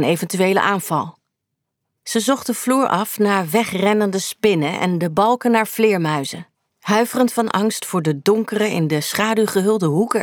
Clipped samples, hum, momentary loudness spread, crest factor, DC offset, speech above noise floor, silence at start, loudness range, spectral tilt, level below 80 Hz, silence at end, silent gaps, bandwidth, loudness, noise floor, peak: under 0.1%; none; 5 LU; 16 dB; under 0.1%; 60 dB; 0 s; 2 LU; -5 dB/octave; -64 dBFS; 0 s; none; over 20 kHz; -18 LUFS; -78 dBFS; -4 dBFS